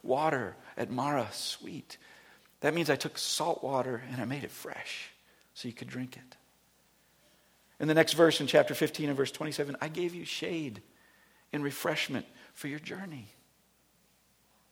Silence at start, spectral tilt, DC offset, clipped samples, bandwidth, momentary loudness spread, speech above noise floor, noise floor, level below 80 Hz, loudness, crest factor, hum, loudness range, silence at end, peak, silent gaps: 0.05 s; -4 dB/octave; under 0.1%; under 0.1%; 20 kHz; 18 LU; 36 dB; -68 dBFS; -76 dBFS; -32 LUFS; 26 dB; none; 10 LU; 1.45 s; -8 dBFS; none